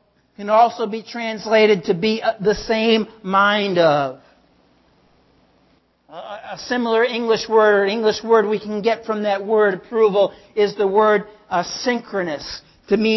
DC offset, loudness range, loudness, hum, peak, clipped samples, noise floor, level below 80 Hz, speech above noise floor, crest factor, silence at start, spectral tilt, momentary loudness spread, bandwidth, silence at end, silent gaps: under 0.1%; 6 LU; -18 LUFS; none; -2 dBFS; under 0.1%; -59 dBFS; -54 dBFS; 41 dB; 16 dB; 0.4 s; -5 dB/octave; 11 LU; 6.2 kHz; 0 s; none